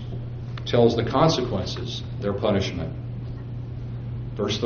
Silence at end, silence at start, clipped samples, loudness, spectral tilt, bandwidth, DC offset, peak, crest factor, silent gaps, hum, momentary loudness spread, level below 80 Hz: 0 s; 0 s; under 0.1%; -25 LUFS; -5.5 dB/octave; 6.8 kHz; under 0.1%; -4 dBFS; 20 dB; none; none; 14 LU; -42 dBFS